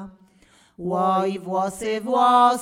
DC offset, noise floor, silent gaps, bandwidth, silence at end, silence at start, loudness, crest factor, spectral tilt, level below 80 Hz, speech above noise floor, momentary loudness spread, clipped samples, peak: under 0.1%; -56 dBFS; none; 15.5 kHz; 0 s; 0 s; -21 LUFS; 16 dB; -5 dB/octave; -62 dBFS; 36 dB; 11 LU; under 0.1%; -6 dBFS